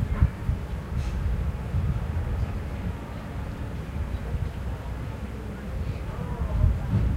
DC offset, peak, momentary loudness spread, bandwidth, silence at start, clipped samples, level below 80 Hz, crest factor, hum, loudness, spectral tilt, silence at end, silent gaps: under 0.1%; -6 dBFS; 9 LU; 13.5 kHz; 0 s; under 0.1%; -30 dBFS; 20 dB; none; -31 LUFS; -8 dB/octave; 0 s; none